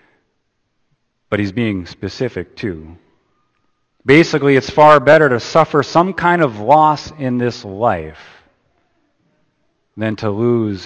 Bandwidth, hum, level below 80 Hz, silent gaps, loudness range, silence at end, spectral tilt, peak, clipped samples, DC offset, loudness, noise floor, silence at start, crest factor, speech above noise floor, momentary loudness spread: 8.8 kHz; none; -50 dBFS; none; 12 LU; 0 s; -6.5 dB/octave; 0 dBFS; under 0.1%; under 0.1%; -14 LUFS; -67 dBFS; 1.3 s; 16 dB; 53 dB; 15 LU